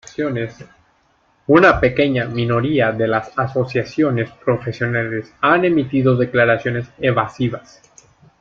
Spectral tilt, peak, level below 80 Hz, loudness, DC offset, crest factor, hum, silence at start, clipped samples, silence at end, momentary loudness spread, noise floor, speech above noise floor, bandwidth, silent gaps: -7.5 dB/octave; 0 dBFS; -44 dBFS; -17 LUFS; under 0.1%; 18 dB; none; 0.2 s; under 0.1%; 0.8 s; 10 LU; -59 dBFS; 42 dB; 7.4 kHz; none